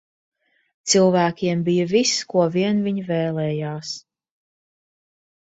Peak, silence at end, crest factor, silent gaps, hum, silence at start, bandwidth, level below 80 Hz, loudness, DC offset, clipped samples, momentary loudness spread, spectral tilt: -4 dBFS; 1.45 s; 18 dB; none; none; 0.85 s; 8 kHz; -64 dBFS; -20 LUFS; under 0.1%; under 0.1%; 13 LU; -4.5 dB/octave